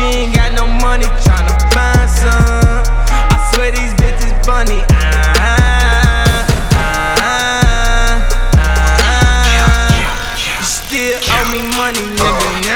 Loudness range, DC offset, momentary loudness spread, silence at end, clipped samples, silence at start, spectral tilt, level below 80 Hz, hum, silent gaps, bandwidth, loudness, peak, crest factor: 1 LU; 0.5%; 5 LU; 0 s; under 0.1%; 0 s; -4 dB/octave; -12 dBFS; none; none; 18 kHz; -12 LUFS; 0 dBFS; 10 dB